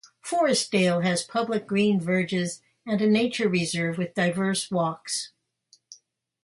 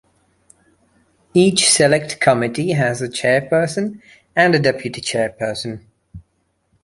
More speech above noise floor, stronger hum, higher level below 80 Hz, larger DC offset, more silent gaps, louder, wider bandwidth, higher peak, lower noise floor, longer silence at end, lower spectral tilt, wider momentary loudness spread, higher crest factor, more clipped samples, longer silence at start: second, 38 dB vs 49 dB; neither; second, -68 dBFS vs -54 dBFS; neither; neither; second, -25 LUFS vs -17 LUFS; about the same, 11.5 kHz vs 11.5 kHz; second, -10 dBFS vs -2 dBFS; about the same, -63 dBFS vs -66 dBFS; second, 0.5 s vs 0.65 s; about the same, -4.5 dB/octave vs -4 dB/octave; second, 8 LU vs 12 LU; about the same, 16 dB vs 18 dB; neither; second, 0.25 s vs 1.35 s